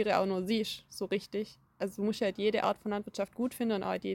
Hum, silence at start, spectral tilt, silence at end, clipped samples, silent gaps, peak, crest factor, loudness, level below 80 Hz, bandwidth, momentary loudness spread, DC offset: none; 0 s; -5.5 dB/octave; 0 s; under 0.1%; none; -14 dBFS; 18 dB; -33 LUFS; -68 dBFS; 17 kHz; 9 LU; under 0.1%